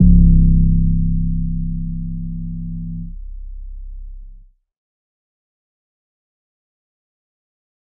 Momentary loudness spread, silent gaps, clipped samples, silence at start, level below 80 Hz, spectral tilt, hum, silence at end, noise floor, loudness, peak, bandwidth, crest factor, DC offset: 24 LU; none; under 0.1%; 0 s; -20 dBFS; -24 dB/octave; none; 3.6 s; -42 dBFS; -19 LUFS; 0 dBFS; 0.6 kHz; 18 dB; under 0.1%